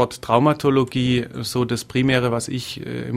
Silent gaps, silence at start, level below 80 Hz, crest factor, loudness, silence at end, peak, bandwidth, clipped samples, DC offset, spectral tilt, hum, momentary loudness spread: none; 0 s; -50 dBFS; 20 dB; -21 LUFS; 0 s; 0 dBFS; 15.5 kHz; under 0.1%; under 0.1%; -5.5 dB/octave; none; 10 LU